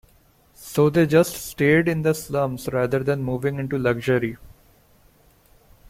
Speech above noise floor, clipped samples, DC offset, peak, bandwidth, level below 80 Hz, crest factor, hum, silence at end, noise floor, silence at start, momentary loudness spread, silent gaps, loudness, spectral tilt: 36 dB; under 0.1%; under 0.1%; -4 dBFS; 16.5 kHz; -50 dBFS; 18 dB; none; 1.4 s; -57 dBFS; 0.6 s; 8 LU; none; -22 LUFS; -6.5 dB/octave